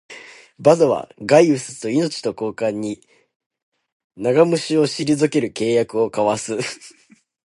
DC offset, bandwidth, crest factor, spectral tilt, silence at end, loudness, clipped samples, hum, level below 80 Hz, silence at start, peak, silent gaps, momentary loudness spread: under 0.1%; 11.5 kHz; 20 dB; -5.5 dB/octave; 0.6 s; -19 LUFS; under 0.1%; none; -62 dBFS; 0.1 s; 0 dBFS; 3.36-3.40 s, 3.46-3.50 s, 3.63-3.72 s, 3.92-4.10 s; 13 LU